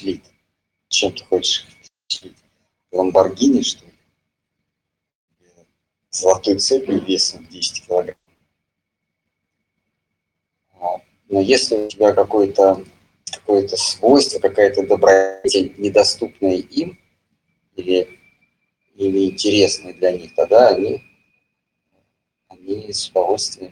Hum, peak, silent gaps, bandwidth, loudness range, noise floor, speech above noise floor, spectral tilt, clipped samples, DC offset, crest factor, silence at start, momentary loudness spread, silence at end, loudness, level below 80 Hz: none; 0 dBFS; 5.15-5.28 s; 11.5 kHz; 8 LU; -79 dBFS; 63 dB; -3 dB/octave; under 0.1%; under 0.1%; 18 dB; 0 s; 15 LU; 0.05 s; -17 LUFS; -58 dBFS